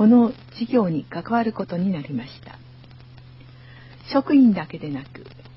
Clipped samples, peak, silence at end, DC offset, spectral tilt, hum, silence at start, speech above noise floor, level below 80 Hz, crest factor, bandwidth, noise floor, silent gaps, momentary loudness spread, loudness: under 0.1%; -6 dBFS; 0.25 s; under 0.1%; -11 dB/octave; none; 0 s; 24 dB; -56 dBFS; 16 dB; 5.8 kHz; -45 dBFS; none; 25 LU; -22 LUFS